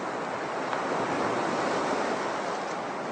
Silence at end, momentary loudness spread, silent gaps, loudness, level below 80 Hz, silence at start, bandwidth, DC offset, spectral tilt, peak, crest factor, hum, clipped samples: 0 s; 4 LU; none; -30 LUFS; -70 dBFS; 0 s; 9.6 kHz; under 0.1%; -4 dB/octave; -12 dBFS; 16 dB; none; under 0.1%